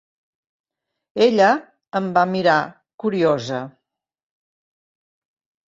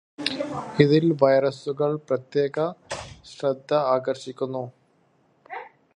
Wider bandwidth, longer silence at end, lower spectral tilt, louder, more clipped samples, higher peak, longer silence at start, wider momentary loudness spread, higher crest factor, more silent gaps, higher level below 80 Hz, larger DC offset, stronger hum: second, 7.8 kHz vs 10.5 kHz; first, 2 s vs 0.25 s; about the same, -6 dB/octave vs -6.5 dB/octave; first, -19 LUFS vs -24 LUFS; neither; about the same, -2 dBFS vs -2 dBFS; first, 1.15 s vs 0.2 s; second, 14 LU vs 20 LU; about the same, 20 dB vs 24 dB; first, 2.94-2.98 s vs none; about the same, -66 dBFS vs -62 dBFS; neither; neither